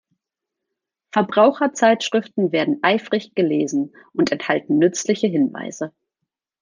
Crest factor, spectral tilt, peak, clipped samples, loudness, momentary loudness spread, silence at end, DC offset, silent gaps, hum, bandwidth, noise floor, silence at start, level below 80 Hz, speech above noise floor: 18 dB; -4.5 dB/octave; -2 dBFS; under 0.1%; -19 LUFS; 9 LU; 0.75 s; under 0.1%; none; none; 10 kHz; -84 dBFS; 1.15 s; -70 dBFS; 65 dB